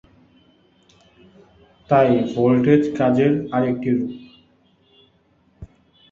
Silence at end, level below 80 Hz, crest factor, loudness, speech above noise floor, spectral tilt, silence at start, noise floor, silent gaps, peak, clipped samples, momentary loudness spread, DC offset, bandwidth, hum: 0.45 s; -54 dBFS; 20 dB; -18 LUFS; 42 dB; -8.5 dB/octave; 1.9 s; -60 dBFS; none; -2 dBFS; under 0.1%; 7 LU; under 0.1%; 7.2 kHz; none